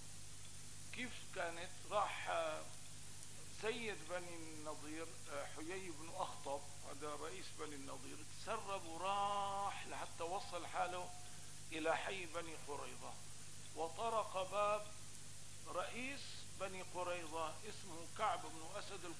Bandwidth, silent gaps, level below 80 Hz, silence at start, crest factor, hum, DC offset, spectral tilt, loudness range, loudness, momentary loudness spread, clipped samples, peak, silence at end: 11 kHz; none; -68 dBFS; 0 s; 20 dB; 50 Hz at -65 dBFS; 0.3%; -3 dB/octave; 4 LU; -46 LUFS; 13 LU; under 0.1%; -26 dBFS; 0 s